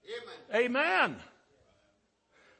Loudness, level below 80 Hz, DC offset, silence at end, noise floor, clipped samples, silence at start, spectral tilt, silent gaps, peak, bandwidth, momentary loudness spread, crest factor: -29 LUFS; -76 dBFS; under 0.1%; 1.35 s; -73 dBFS; under 0.1%; 0.1 s; -4 dB/octave; none; -14 dBFS; 8.8 kHz; 17 LU; 20 dB